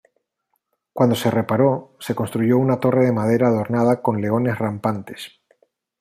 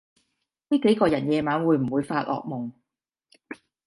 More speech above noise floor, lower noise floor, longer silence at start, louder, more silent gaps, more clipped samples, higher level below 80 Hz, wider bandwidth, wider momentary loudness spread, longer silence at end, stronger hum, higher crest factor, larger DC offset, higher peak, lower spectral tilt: second, 55 dB vs 61 dB; second, -73 dBFS vs -84 dBFS; first, 0.95 s vs 0.7 s; first, -20 LUFS vs -24 LUFS; neither; neither; about the same, -62 dBFS vs -62 dBFS; first, 15.5 kHz vs 11.5 kHz; second, 11 LU vs 19 LU; first, 0.7 s vs 0.35 s; neither; about the same, 18 dB vs 18 dB; neither; first, -2 dBFS vs -8 dBFS; about the same, -7.5 dB/octave vs -7.5 dB/octave